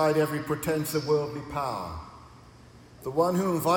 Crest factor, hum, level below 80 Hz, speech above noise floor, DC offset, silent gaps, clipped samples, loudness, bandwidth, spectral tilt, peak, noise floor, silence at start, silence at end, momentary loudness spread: 16 dB; none; -56 dBFS; 24 dB; under 0.1%; none; under 0.1%; -28 LUFS; 18 kHz; -5.5 dB/octave; -12 dBFS; -51 dBFS; 0 s; 0 s; 14 LU